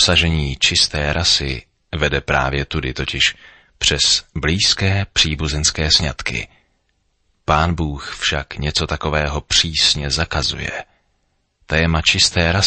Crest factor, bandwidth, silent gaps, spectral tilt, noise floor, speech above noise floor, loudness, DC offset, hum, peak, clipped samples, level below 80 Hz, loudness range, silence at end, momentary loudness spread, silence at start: 18 dB; 8.8 kHz; none; -3 dB/octave; -66 dBFS; 48 dB; -17 LUFS; under 0.1%; none; 0 dBFS; under 0.1%; -30 dBFS; 3 LU; 0 s; 10 LU; 0 s